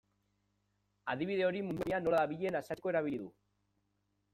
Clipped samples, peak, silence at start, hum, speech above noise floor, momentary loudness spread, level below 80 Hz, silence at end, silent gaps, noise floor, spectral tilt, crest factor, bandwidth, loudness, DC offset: under 0.1%; -20 dBFS; 1.05 s; 50 Hz at -65 dBFS; 45 dB; 10 LU; -70 dBFS; 1.05 s; none; -80 dBFS; -7 dB/octave; 18 dB; 16 kHz; -35 LUFS; under 0.1%